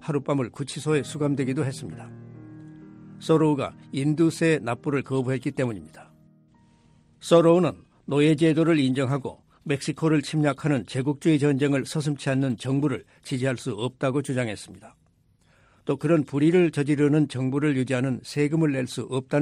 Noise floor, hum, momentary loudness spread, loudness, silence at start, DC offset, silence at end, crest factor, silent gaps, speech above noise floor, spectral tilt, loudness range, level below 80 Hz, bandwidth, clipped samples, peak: -62 dBFS; none; 16 LU; -24 LUFS; 0 s; under 0.1%; 0 s; 18 dB; none; 39 dB; -6.5 dB/octave; 5 LU; -64 dBFS; 13 kHz; under 0.1%; -6 dBFS